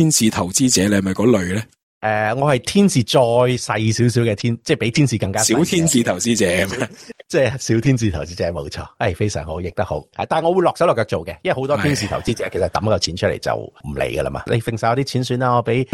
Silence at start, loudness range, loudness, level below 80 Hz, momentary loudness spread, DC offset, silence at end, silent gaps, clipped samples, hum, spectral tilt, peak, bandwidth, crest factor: 0 s; 4 LU; -18 LUFS; -44 dBFS; 9 LU; under 0.1%; 0.1 s; 1.83-2.01 s; under 0.1%; none; -4.5 dB/octave; -2 dBFS; 16 kHz; 16 dB